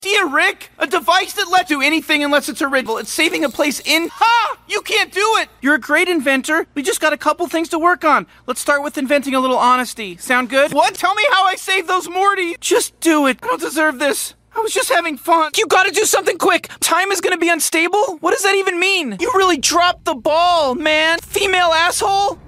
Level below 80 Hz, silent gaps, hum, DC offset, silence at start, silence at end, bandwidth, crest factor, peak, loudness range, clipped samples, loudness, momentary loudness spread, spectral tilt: -54 dBFS; none; none; under 0.1%; 0 s; 0 s; 16 kHz; 14 dB; -2 dBFS; 2 LU; under 0.1%; -15 LUFS; 5 LU; -1.5 dB/octave